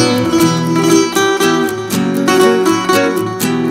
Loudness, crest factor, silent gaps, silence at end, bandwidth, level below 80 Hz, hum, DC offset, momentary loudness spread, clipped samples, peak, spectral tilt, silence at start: -12 LUFS; 12 dB; none; 0 s; 16.5 kHz; -50 dBFS; none; under 0.1%; 5 LU; under 0.1%; 0 dBFS; -4.5 dB/octave; 0 s